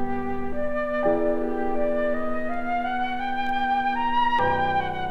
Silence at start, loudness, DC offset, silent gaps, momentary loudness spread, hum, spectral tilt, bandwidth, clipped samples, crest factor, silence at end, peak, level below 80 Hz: 0 s; -25 LUFS; under 0.1%; none; 7 LU; none; -6.5 dB/octave; 6 kHz; under 0.1%; 14 dB; 0 s; -10 dBFS; -40 dBFS